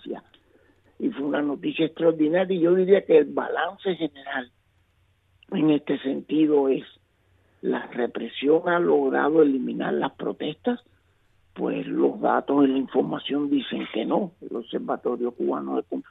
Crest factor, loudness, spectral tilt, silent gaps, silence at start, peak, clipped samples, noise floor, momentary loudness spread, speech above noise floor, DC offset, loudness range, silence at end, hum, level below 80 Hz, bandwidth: 18 dB; -24 LUFS; -9 dB/octave; none; 0.05 s; -6 dBFS; under 0.1%; -65 dBFS; 11 LU; 42 dB; under 0.1%; 4 LU; 0.1 s; none; -70 dBFS; 4 kHz